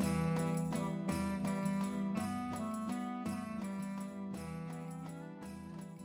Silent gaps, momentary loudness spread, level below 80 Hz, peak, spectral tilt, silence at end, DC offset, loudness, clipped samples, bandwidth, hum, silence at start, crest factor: none; 12 LU; -62 dBFS; -22 dBFS; -6.5 dB/octave; 0 s; under 0.1%; -39 LUFS; under 0.1%; 16.5 kHz; none; 0 s; 16 dB